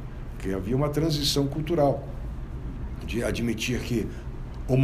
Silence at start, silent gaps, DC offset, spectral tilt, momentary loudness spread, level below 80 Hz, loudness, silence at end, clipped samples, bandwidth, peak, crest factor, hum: 0 s; none; under 0.1%; -5.5 dB/octave; 13 LU; -36 dBFS; -28 LUFS; 0 s; under 0.1%; 15.5 kHz; -8 dBFS; 18 dB; none